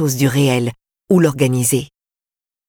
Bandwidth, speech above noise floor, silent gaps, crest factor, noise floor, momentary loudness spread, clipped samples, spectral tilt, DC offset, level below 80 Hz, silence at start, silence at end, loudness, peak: 19 kHz; over 75 dB; none; 14 dB; under -90 dBFS; 8 LU; under 0.1%; -5.5 dB/octave; under 0.1%; -52 dBFS; 0 s; 0.85 s; -16 LUFS; -4 dBFS